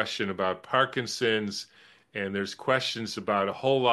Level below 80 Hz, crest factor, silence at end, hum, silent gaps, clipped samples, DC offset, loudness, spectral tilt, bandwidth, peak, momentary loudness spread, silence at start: -72 dBFS; 20 dB; 0 s; none; none; under 0.1%; under 0.1%; -28 LUFS; -4 dB/octave; 12.5 kHz; -8 dBFS; 9 LU; 0 s